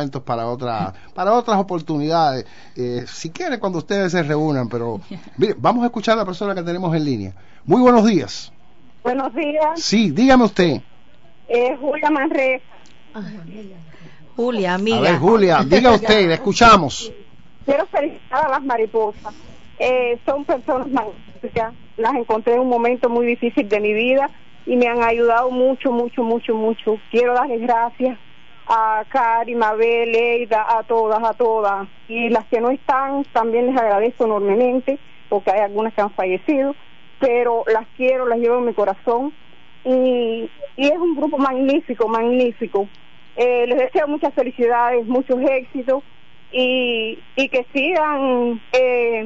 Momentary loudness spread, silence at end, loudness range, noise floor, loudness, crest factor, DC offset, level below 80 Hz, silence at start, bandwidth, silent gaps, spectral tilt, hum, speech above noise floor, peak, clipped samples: 12 LU; 0 s; 5 LU; -52 dBFS; -18 LUFS; 18 dB; 1%; -48 dBFS; 0 s; 7.8 kHz; none; -5.5 dB/octave; none; 34 dB; 0 dBFS; under 0.1%